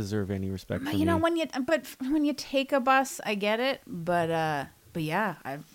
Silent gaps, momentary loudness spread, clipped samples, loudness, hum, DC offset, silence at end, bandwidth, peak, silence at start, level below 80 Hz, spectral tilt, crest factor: none; 9 LU; under 0.1%; -28 LUFS; none; under 0.1%; 0.1 s; 17 kHz; -12 dBFS; 0 s; -60 dBFS; -5.5 dB/octave; 16 dB